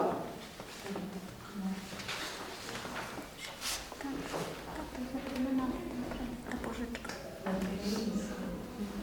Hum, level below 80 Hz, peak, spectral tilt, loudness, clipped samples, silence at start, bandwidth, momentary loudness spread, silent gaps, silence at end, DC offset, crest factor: none; -54 dBFS; -18 dBFS; -4.5 dB/octave; -39 LUFS; under 0.1%; 0 s; over 20 kHz; 8 LU; none; 0 s; under 0.1%; 20 dB